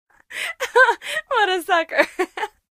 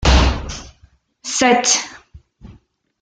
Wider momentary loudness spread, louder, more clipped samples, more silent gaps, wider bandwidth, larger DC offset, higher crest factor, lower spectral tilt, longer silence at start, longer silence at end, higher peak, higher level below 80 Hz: second, 12 LU vs 19 LU; second, -19 LUFS vs -16 LUFS; neither; neither; first, 15.5 kHz vs 9.4 kHz; neither; about the same, 20 dB vs 18 dB; second, -0.5 dB/octave vs -3 dB/octave; first, 0.3 s vs 0 s; second, 0.3 s vs 0.5 s; about the same, -2 dBFS vs 0 dBFS; second, -64 dBFS vs -24 dBFS